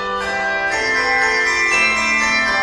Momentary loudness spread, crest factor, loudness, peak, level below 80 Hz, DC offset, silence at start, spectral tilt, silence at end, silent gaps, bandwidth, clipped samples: 6 LU; 14 dB; -15 LUFS; -4 dBFS; -44 dBFS; under 0.1%; 0 s; -1.5 dB/octave; 0 s; none; 12 kHz; under 0.1%